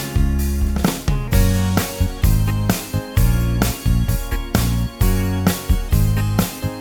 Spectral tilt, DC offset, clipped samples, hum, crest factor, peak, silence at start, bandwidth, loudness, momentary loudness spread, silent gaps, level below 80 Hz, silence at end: -5.5 dB/octave; under 0.1%; under 0.1%; none; 14 dB; -2 dBFS; 0 s; over 20 kHz; -19 LUFS; 4 LU; none; -22 dBFS; 0 s